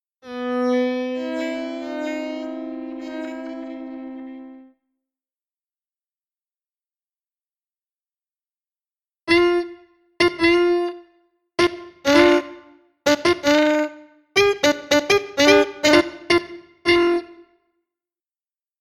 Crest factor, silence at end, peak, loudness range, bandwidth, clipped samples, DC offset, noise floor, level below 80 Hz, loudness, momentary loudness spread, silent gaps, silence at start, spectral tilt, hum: 22 dB; 1.45 s; 0 dBFS; 16 LU; 14.5 kHz; under 0.1%; under 0.1%; under -90 dBFS; -54 dBFS; -19 LUFS; 18 LU; none; 0.25 s; -3.5 dB/octave; none